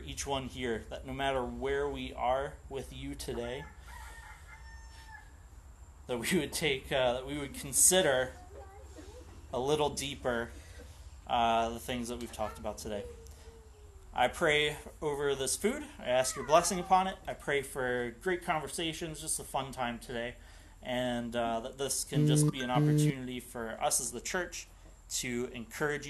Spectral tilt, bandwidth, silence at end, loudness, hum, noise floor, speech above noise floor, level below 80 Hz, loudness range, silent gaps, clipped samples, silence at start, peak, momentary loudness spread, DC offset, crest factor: -3.5 dB/octave; 12.5 kHz; 0 s; -32 LUFS; none; -53 dBFS; 20 dB; -52 dBFS; 8 LU; none; under 0.1%; 0 s; -10 dBFS; 23 LU; under 0.1%; 24 dB